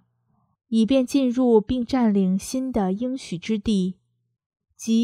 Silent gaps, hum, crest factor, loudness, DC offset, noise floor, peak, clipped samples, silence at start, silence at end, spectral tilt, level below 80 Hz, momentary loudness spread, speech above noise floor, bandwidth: 4.46-4.50 s; none; 16 dB; -22 LUFS; under 0.1%; -68 dBFS; -6 dBFS; under 0.1%; 0.7 s; 0 s; -6.5 dB/octave; -50 dBFS; 9 LU; 47 dB; 14 kHz